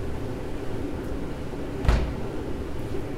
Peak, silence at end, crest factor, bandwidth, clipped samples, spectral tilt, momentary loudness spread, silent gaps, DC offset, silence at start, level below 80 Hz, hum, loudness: -6 dBFS; 0 s; 22 dB; 15 kHz; under 0.1%; -7 dB/octave; 8 LU; none; under 0.1%; 0 s; -32 dBFS; none; -31 LUFS